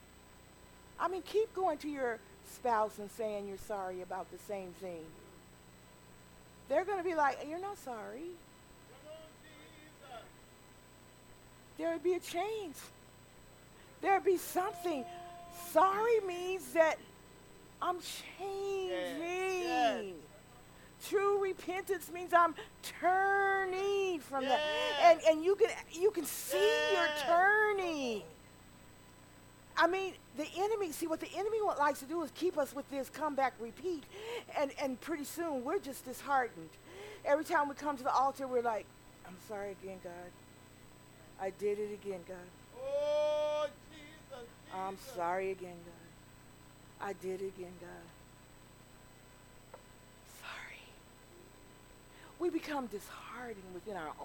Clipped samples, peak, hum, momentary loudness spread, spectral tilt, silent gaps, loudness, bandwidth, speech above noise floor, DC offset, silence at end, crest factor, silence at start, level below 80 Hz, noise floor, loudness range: under 0.1%; -14 dBFS; none; 22 LU; -3.5 dB/octave; none; -35 LUFS; 19 kHz; 24 dB; under 0.1%; 0 s; 24 dB; 0.2 s; -66 dBFS; -59 dBFS; 16 LU